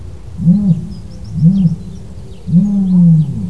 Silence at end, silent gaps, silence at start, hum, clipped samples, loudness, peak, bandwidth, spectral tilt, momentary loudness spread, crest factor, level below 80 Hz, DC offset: 0 s; none; 0 s; none; under 0.1%; -12 LUFS; 0 dBFS; 5.6 kHz; -10.5 dB/octave; 21 LU; 12 dB; -34 dBFS; 3%